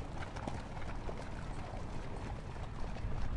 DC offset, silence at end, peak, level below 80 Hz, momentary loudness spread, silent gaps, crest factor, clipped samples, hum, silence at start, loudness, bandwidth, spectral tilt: under 0.1%; 0 s; -24 dBFS; -44 dBFS; 2 LU; none; 16 dB; under 0.1%; none; 0 s; -45 LUFS; 11 kHz; -6.5 dB/octave